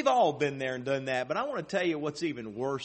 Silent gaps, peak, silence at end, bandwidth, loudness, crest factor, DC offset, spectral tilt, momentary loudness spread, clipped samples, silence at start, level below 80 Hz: none; -12 dBFS; 0 s; 8.4 kHz; -31 LUFS; 18 dB; under 0.1%; -5 dB/octave; 8 LU; under 0.1%; 0 s; -70 dBFS